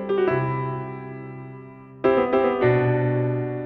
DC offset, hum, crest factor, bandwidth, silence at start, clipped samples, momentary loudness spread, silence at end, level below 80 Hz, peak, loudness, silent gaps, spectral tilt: under 0.1%; none; 16 dB; 4.7 kHz; 0 s; under 0.1%; 19 LU; 0 s; -54 dBFS; -6 dBFS; -22 LUFS; none; -10.5 dB/octave